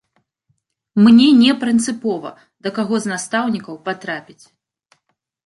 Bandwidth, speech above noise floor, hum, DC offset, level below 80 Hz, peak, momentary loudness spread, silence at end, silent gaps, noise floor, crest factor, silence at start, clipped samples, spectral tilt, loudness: 11.5 kHz; 55 dB; none; under 0.1%; -62 dBFS; -2 dBFS; 18 LU; 1.25 s; none; -71 dBFS; 16 dB; 0.95 s; under 0.1%; -4.5 dB/octave; -16 LUFS